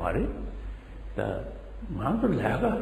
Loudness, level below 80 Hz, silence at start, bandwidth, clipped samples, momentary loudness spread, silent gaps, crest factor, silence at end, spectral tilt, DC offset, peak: -30 LUFS; -38 dBFS; 0 s; 13.5 kHz; under 0.1%; 16 LU; none; 18 dB; 0 s; -8.5 dB/octave; under 0.1%; -12 dBFS